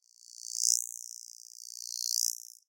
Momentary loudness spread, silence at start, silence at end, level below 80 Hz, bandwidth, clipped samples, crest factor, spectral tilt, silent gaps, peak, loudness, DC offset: 19 LU; 0.3 s; 0.25 s; under -90 dBFS; 17 kHz; under 0.1%; 32 dB; 10.5 dB/octave; none; -4 dBFS; -31 LUFS; under 0.1%